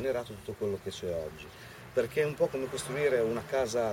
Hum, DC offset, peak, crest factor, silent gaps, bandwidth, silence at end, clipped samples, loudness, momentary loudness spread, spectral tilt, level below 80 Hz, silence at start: none; under 0.1%; -16 dBFS; 16 dB; none; 16.5 kHz; 0 s; under 0.1%; -32 LUFS; 13 LU; -5 dB/octave; -58 dBFS; 0 s